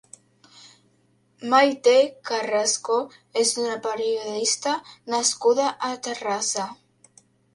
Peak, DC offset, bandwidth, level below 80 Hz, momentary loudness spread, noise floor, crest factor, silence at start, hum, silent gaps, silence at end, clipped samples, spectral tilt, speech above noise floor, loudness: -6 dBFS; under 0.1%; 11.5 kHz; -76 dBFS; 11 LU; -64 dBFS; 18 dB; 1.4 s; none; none; 0.8 s; under 0.1%; -1 dB/octave; 41 dB; -23 LUFS